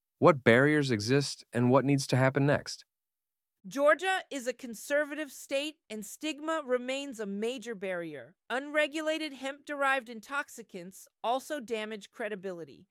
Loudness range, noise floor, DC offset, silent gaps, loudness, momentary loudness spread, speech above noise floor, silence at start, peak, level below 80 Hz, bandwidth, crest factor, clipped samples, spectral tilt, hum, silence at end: 7 LU; under -90 dBFS; under 0.1%; none; -30 LUFS; 16 LU; over 59 dB; 0.2 s; -8 dBFS; -72 dBFS; 16 kHz; 24 dB; under 0.1%; -5.5 dB/octave; none; 0.15 s